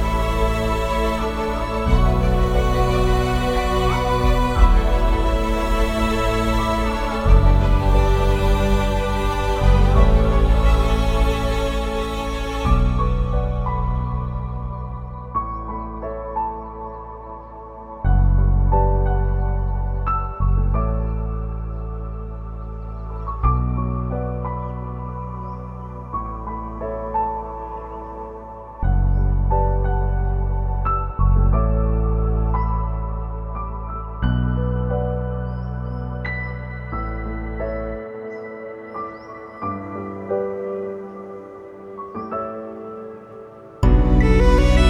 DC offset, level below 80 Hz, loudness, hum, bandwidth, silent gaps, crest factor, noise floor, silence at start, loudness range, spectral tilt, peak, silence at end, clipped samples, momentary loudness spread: under 0.1%; -22 dBFS; -22 LUFS; none; 10.5 kHz; none; 18 dB; -39 dBFS; 0 s; 10 LU; -7 dB/octave; -2 dBFS; 0 s; under 0.1%; 15 LU